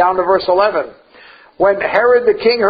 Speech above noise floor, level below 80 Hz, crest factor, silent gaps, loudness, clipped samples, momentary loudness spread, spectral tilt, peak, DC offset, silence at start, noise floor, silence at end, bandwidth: 30 dB; -50 dBFS; 14 dB; none; -13 LUFS; under 0.1%; 6 LU; -7 dB/octave; 0 dBFS; under 0.1%; 0 s; -42 dBFS; 0 s; 5 kHz